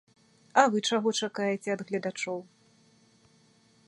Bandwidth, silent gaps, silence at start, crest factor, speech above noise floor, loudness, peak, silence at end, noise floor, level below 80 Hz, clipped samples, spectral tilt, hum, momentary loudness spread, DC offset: 11.5 kHz; none; 0.55 s; 24 dB; 35 dB; -28 LUFS; -6 dBFS; 1.45 s; -63 dBFS; -80 dBFS; under 0.1%; -3.5 dB/octave; none; 11 LU; under 0.1%